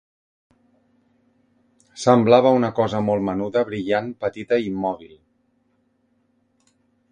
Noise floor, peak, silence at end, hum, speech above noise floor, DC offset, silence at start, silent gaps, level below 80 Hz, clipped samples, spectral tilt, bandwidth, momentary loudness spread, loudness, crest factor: -66 dBFS; 0 dBFS; 2.05 s; none; 46 dB; under 0.1%; 1.95 s; none; -58 dBFS; under 0.1%; -6.5 dB/octave; 10 kHz; 13 LU; -20 LUFS; 22 dB